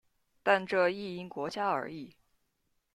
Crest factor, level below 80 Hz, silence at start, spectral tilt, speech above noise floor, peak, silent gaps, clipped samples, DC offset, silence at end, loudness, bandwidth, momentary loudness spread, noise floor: 22 dB; -76 dBFS; 0.45 s; -5.5 dB/octave; 46 dB; -12 dBFS; none; under 0.1%; under 0.1%; 0.85 s; -31 LUFS; 13 kHz; 15 LU; -78 dBFS